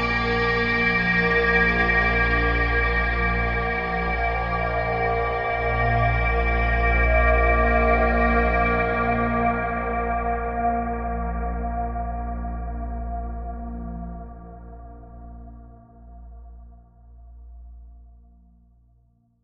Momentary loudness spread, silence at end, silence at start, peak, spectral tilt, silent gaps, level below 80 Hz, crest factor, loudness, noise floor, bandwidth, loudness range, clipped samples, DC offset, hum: 16 LU; 1.4 s; 0 s; -8 dBFS; -8 dB/octave; none; -28 dBFS; 16 dB; -22 LUFS; -61 dBFS; 5.8 kHz; 15 LU; under 0.1%; under 0.1%; none